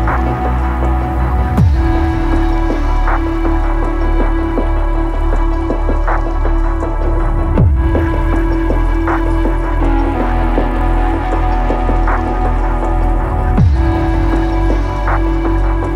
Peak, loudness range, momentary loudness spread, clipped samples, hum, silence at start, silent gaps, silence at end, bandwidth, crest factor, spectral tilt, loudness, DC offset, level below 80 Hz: 0 dBFS; 2 LU; 5 LU; under 0.1%; none; 0 s; none; 0 s; 6 kHz; 12 dB; -8.5 dB/octave; -16 LUFS; under 0.1%; -14 dBFS